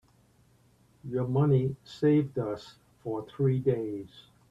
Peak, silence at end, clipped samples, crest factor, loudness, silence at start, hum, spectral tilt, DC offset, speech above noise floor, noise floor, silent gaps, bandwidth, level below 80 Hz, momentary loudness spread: -14 dBFS; 0.3 s; under 0.1%; 16 dB; -29 LUFS; 1.05 s; none; -9.5 dB/octave; under 0.1%; 35 dB; -63 dBFS; none; 7.8 kHz; -64 dBFS; 16 LU